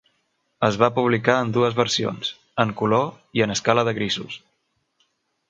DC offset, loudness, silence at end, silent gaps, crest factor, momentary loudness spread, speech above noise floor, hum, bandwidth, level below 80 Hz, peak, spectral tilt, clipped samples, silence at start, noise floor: under 0.1%; -21 LUFS; 1.1 s; none; 22 dB; 8 LU; 51 dB; none; 9.2 kHz; -60 dBFS; -2 dBFS; -4.5 dB/octave; under 0.1%; 0.6 s; -72 dBFS